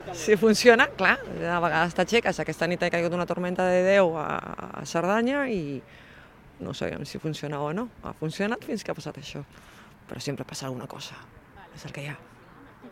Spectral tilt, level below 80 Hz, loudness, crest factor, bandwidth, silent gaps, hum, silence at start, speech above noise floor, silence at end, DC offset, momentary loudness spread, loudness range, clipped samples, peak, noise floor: -5 dB/octave; -56 dBFS; -25 LUFS; 24 dB; 16 kHz; none; none; 0 s; 24 dB; 0 s; under 0.1%; 18 LU; 15 LU; under 0.1%; -2 dBFS; -50 dBFS